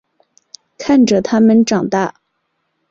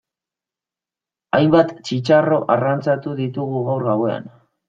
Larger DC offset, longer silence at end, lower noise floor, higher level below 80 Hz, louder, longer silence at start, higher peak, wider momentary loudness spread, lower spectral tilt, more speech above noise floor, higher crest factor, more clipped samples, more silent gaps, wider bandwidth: neither; first, 0.8 s vs 0.4 s; second, -68 dBFS vs -89 dBFS; first, -54 dBFS vs -60 dBFS; first, -13 LUFS vs -18 LUFS; second, 0.8 s vs 1.35 s; about the same, -2 dBFS vs -2 dBFS; about the same, 10 LU vs 9 LU; second, -5.5 dB/octave vs -7.5 dB/octave; second, 57 dB vs 71 dB; second, 12 dB vs 18 dB; neither; neither; about the same, 7.8 kHz vs 7.8 kHz